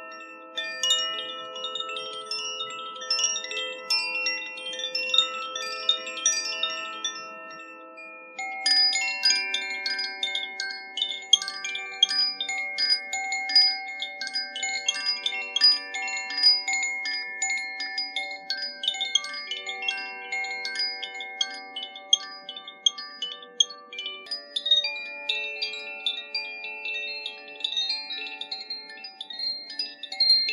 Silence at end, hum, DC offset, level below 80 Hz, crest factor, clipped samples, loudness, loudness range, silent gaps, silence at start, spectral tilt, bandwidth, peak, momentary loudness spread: 0 s; none; under 0.1%; under -90 dBFS; 26 dB; under 0.1%; -25 LUFS; 6 LU; none; 0 s; 3 dB/octave; 14.5 kHz; -4 dBFS; 14 LU